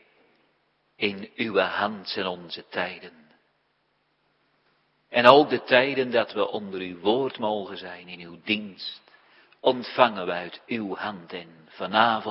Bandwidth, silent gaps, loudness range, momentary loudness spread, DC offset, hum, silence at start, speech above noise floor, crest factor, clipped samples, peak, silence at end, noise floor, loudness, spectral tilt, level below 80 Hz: 10.5 kHz; none; 8 LU; 18 LU; under 0.1%; none; 1 s; 46 dB; 26 dB; under 0.1%; 0 dBFS; 0 s; -71 dBFS; -24 LUFS; -6.5 dB/octave; -74 dBFS